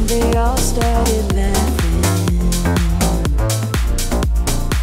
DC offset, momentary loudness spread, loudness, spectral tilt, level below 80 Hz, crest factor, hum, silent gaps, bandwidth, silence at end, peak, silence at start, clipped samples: under 0.1%; 3 LU; -17 LUFS; -5 dB/octave; -18 dBFS; 12 dB; none; none; 16.5 kHz; 0 s; -2 dBFS; 0 s; under 0.1%